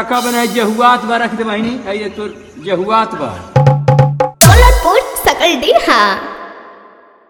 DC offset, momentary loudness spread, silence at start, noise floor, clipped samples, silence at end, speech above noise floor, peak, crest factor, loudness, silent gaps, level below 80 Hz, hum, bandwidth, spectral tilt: under 0.1%; 15 LU; 0 s; -42 dBFS; 0.7%; 0.55 s; 28 dB; 0 dBFS; 12 dB; -11 LUFS; none; -22 dBFS; none; over 20 kHz; -4.5 dB/octave